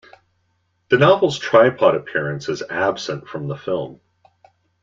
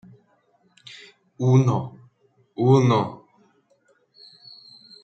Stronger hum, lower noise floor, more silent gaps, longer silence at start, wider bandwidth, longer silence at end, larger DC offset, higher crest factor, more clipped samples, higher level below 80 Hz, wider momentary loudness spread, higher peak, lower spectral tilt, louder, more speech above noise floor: neither; first, -67 dBFS vs -63 dBFS; neither; second, 0.9 s vs 1.4 s; about the same, 7.6 kHz vs 7.4 kHz; second, 0.9 s vs 1.9 s; neither; about the same, 18 dB vs 20 dB; neither; first, -60 dBFS vs -66 dBFS; second, 14 LU vs 26 LU; about the same, -2 dBFS vs -4 dBFS; second, -5.5 dB/octave vs -8 dB/octave; about the same, -18 LUFS vs -20 LUFS; first, 49 dB vs 44 dB